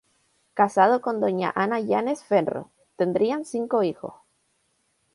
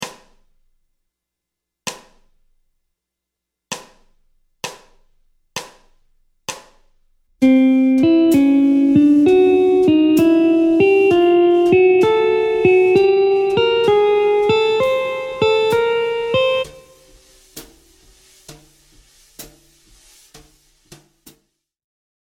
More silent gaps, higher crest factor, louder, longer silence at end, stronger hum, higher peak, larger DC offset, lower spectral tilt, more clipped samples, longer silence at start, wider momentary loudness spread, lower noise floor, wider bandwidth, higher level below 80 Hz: neither; about the same, 20 dB vs 16 dB; second, -24 LUFS vs -14 LUFS; second, 1 s vs 2.75 s; neither; second, -4 dBFS vs 0 dBFS; neither; about the same, -6.5 dB/octave vs -5.5 dB/octave; neither; first, 0.55 s vs 0 s; second, 12 LU vs 19 LU; second, -70 dBFS vs -82 dBFS; second, 11.5 kHz vs 16.5 kHz; second, -72 dBFS vs -52 dBFS